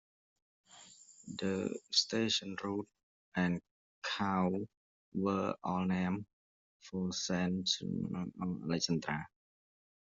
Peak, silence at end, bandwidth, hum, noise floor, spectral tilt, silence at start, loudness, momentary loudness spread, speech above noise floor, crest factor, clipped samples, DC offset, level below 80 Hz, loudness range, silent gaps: -16 dBFS; 0.75 s; 8 kHz; none; -59 dBFS; -4.5 dB/octave; 0.7 s; -36 LUFS; 15 LU; 23 dB; 20 dB; under 0.1%; under 0.1%; -72 dBFS; 2 LU; 3.03-3.32 s, 3.71-4.02 s, 4.77-5.12 s, 6.33-6.80 s